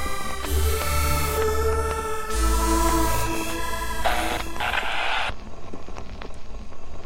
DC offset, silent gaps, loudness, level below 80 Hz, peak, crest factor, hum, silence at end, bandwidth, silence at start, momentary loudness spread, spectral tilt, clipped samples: under 0.1%; none; -25 LUFS; -30 dBFS; -8 dBFS; 14 dB; none; 0 s; 16 kHz; 0 s; 18 LU; -4 dB/octave; under 0.1%